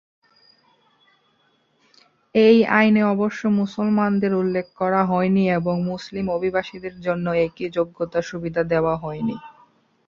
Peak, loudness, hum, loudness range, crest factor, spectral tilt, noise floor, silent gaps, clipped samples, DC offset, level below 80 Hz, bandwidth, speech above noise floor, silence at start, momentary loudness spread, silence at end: -2 dBFS; -21 LUFS; none; 5 LU; 20 dB; -7.5 dB/octave; -64 dBFS; none; under 0.1%; under 0.1%; -56 dBFS; 7.2 kHz; 44 dB; 2.35 s; 11 LU; 0.6 s